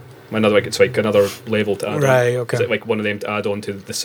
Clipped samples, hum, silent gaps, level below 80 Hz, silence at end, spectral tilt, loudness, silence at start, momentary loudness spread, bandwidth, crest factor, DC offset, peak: under 0.1%; none; none; -62 dBFS; 0 s; -5 dB/octave; -18 LUFS; 0 s; 8 LU; 20 kHz; 18 dB; under 0.1%; -2 dBFS